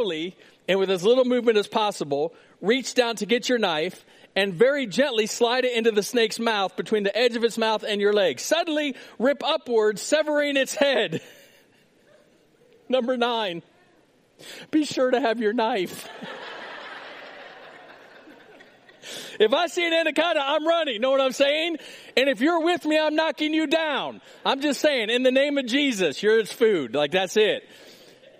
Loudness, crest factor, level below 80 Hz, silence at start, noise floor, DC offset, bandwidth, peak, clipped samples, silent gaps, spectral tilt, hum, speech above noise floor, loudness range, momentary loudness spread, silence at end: -23 LUFS; 20 dB; -78 dBFS; 0 s; -60 dBFS; under 0.1%; 15.5 kHz; -4 dBFS; under 0.1%; none; -3.5 dB/octave; none; 37 dB; 7 LU; 14 LU; 0.5 s